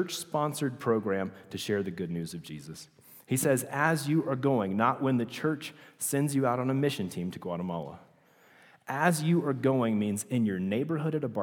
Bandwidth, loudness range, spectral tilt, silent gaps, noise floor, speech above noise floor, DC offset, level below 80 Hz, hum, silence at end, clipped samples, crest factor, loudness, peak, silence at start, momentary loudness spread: 20 kHz; 4 LU; -5.5 dB/octave; none; -61 dBFS; 31 dB; under 0.1%; -72 dBFS; none; 0 s; under 0.1%; 22 dB; -30 LUFS; -8 dBFS; 0 s; 12 LU